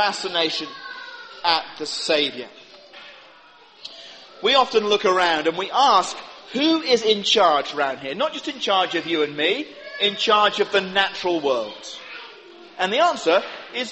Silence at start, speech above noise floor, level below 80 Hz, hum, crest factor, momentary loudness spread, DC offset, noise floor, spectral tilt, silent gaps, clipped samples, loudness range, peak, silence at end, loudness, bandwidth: 0 s; 29 dB; -66 dBFS; none; 20 dB; 20 LU; under 0.1%; -49 dBFS; -2.5 dB/octave; none; under 0.1%; 6 LU; -2 dBFS; 0 s; -20 LUFS; 8.4 kHz